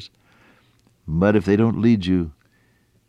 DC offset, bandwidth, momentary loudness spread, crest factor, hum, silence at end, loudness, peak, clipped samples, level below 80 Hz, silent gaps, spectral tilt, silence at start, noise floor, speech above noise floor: under 0.1%; 8.8 kHz; 13 LU; 16 dB; none; 0.75 s; -19 LUFS; -6 dBFS; under 0.1%; -46 dBFS; none; -8.5 dB/octave; 0 s; -61 dBFS; 43 dB